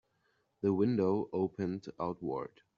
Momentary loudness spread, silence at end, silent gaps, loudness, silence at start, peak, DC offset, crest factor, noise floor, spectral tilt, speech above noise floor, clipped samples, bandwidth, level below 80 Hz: 9 LU; 0.3 s; none; -34 LUFS; 0.65 s; -18 dBFS; under 0.1%; 16 dB; -76 dBFS; -8.5 dB/octave; 43 dB; under 0.1%; 7 kHz; -72 dBFS